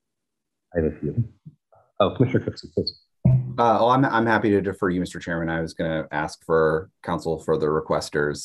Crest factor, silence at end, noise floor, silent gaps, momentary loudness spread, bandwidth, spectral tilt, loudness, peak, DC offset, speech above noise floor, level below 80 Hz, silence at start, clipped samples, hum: 18 dB; 0 s; -83 dBFS; none; 9 LU; 12 kHz; -6.5 dB/octave; -23 LUFS; -4 dBFS; under 0.1%; 60 dB; -48 dBFS; 0.75 s; under 0.1%; none